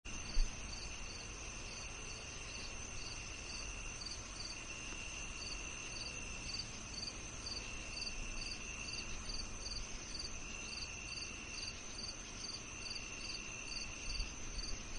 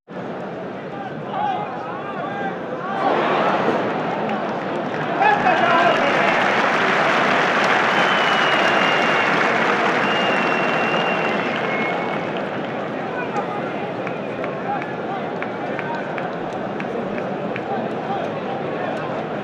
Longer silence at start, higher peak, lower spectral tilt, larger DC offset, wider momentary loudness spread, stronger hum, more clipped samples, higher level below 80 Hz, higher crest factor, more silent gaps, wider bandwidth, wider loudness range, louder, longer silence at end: about the same, 0.05 s vs 0.1 s; second, -22 dBFS vs -4 dBFS; second, -1.5 dB/octave vs -5 dB/octave; neither; second, 3 LU vs 10 LU; neither; neither; first, -48 dBFS vs -62 dBFS; first, 22 dB vs 16 dB; neither; second, 11 kHz vs over 20 kHz; second, 2 LU vs 9 LU; second, -44 LUFS vs -20 LUFS; about the same, 0 s vs 0 s